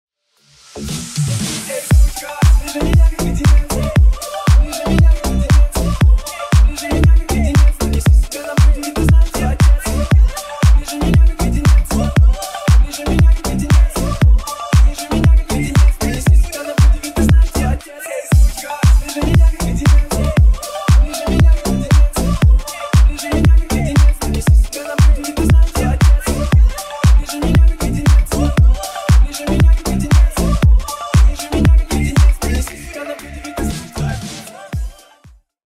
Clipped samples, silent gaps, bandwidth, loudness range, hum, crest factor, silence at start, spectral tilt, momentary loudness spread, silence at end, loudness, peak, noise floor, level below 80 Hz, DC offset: under 0.1%; none; 15 kHz; 1 LU; none; 12 dB; 0.75 s; -6 dB/octave; 7 LU; 0.75 s; -14 LUFS; 0 dBFS; -54 dBFS; -14 dBFS; under 0.1%